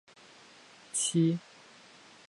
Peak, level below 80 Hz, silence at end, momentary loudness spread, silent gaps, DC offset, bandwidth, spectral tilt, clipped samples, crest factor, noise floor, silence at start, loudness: -18 dBFS; -80 dBFS; 0.9 s; 26 LU; none; under 0.1%; 11.5 kHz; -4.5 dB/octave; under 0.1%; 18 dB; -56 dBFS; 0.95 s; -30 LUFS